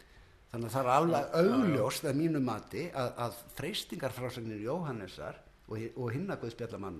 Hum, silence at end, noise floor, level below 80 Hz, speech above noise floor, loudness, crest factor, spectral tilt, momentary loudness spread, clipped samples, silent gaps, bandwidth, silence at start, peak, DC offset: none; 0 s; -59 dBFS; -62 dBFS; 25 dB; -33 LUFS; 22 dB; -6 dB/octave; 14 LU; under 0.1%; none; 13.5 kHz; 0.15 s; -12 dBFS; under 0.1%